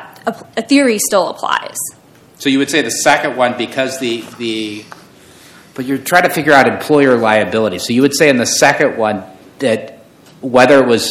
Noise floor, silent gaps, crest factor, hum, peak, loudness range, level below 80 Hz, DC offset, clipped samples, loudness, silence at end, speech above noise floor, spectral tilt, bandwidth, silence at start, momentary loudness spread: -41 dBFS; none; 14 dB; none; 0 dBFS; 5 LU; -56 dBFS; under 0.1%; 0.5%; -13 LUFS; 0 s; 28 dB; -3.5 dB/octave; 16.5 kHz; 0 s; 13 LU